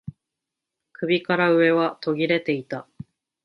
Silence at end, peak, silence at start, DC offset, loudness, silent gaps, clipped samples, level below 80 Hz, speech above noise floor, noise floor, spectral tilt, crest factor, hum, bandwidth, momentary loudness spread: 0.65 s; -6 dBFS; 0.05 s; under 0.1%; -22 LUFS; none; under 0.1%; -64 dBFS; 63 dB; -85 dBFS; -8 dB/octave; 18 dB; none; 5.8 kHz; 17 LU